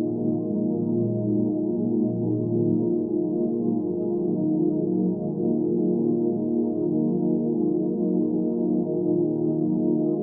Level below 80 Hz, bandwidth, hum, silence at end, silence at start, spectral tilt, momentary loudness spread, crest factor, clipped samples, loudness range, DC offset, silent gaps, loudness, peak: -66 dBFS; 1.3 kHz; none; 0 s; 0 s; -16 dB/octave; 2 LU; 12 dB; under 0.1%; 1 LU; under 0.1%; none; -24 LUFS; -12 dBFS